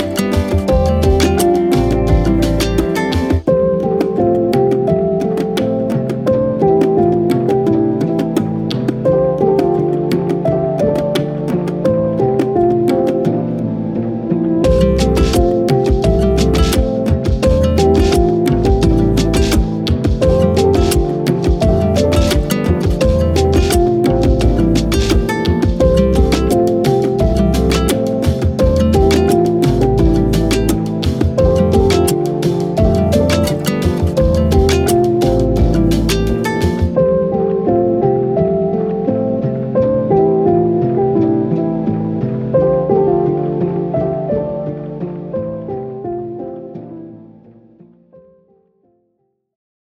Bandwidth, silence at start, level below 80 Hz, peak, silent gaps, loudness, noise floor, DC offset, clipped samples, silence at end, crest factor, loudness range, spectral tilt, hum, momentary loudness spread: 16.5 kHz; 0 s; -22 dBFS; 0 dBFS; none; -14 LUFS; -66 dBFS; under 0.1%; under 0.1%; 2.65 s; 14 dB; 3 LU; -7 dB/octave; none; 6 LU